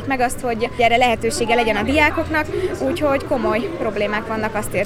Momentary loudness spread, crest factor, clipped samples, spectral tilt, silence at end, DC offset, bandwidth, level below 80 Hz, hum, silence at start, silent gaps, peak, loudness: 7 LU; 18 dB; under 0.1%; -4.5 dB/octave; 0 s; under 0.1%; 17 kHz; -36 dBFS; none; 0 s; none; -2 dBFS; -19 LUFS